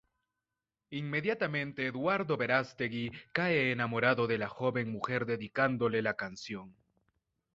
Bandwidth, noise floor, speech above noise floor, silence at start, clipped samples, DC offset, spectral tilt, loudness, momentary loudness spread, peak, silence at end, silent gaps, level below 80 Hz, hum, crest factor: 7.8 kHz; under -90 dBFS; over 57 dB; 0.9 s; under 0.1%; under 0.1%; -4 dB/octave; -32 LUFS; 10 LU; -12 dBFS; 0.85 s; none; -70 dBFS; none; 22 dB